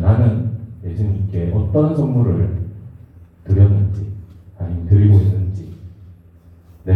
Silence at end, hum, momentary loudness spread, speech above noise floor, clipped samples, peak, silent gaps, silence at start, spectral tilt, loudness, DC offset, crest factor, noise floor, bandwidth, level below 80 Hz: 0 s; none; 18 LU; 32 dB; under 0.1%; 0 dBFS; none; 0 s; -11.5 dB/octave; -17 LUFS; under 0.1%; 16 dB; -45 dBFS; 3.4 kHz; -40 dBFS